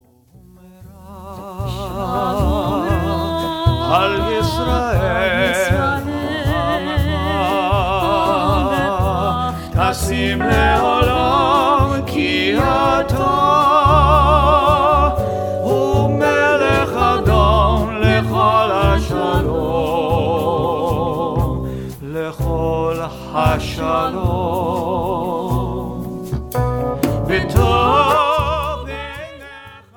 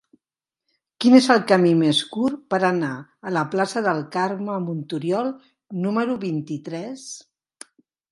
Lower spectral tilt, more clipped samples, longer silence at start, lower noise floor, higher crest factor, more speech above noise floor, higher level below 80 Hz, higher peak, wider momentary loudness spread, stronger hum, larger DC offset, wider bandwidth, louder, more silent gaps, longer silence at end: about the same, -6 dB/octave vs -5.5 dB/octave; neither; second, 0.8 s vs 1 s; second, -47 dBFS vs -89 dBFS; second, 16 dB vs 22 dB; second, 31 dB vs 68 dB; first, -26 dBFS vs -70 dBFS; about the same, 0 dBFS vs 0 dBFS; second, 11 LU vs 17 LU; neither; neither; first, 18 kHz vs 11.5 kHz; first, -16 LUFS vs -21 LUFS; neither; second, 0.2 s vs 0.9 s